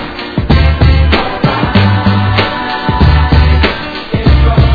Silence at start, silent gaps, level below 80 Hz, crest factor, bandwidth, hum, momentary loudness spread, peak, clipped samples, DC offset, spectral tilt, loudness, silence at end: 0 s; none; -12 dBFS; 8 dB; 5 kHz; none; 6 LU; 0 dBFS; 0.5%; under 0.1%; -8.5 dB/octave; -10 LUFS; 0 s